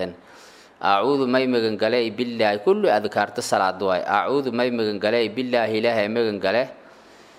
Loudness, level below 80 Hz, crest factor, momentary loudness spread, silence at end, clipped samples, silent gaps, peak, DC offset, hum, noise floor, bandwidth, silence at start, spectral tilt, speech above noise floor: -22 LUFS; -70 dBFS; 18 dB; 4 LU; 0.65 s; under 0.1%; none; -4 dBFS; under 0.1%; none; -48 dBFS; 15.5 kHz; 0 s; -5 dB/octave; 27 dB